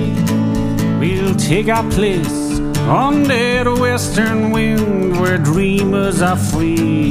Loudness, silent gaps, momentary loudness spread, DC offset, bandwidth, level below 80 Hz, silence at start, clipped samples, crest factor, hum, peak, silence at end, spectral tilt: -15 LUFS; none; 3 LU; under 0.1%; 15.5 kHz; -30 dBFS; 0 s; under 0.1%; 14 dB; none; 0 dBFS; 0 s; -6 dB/octave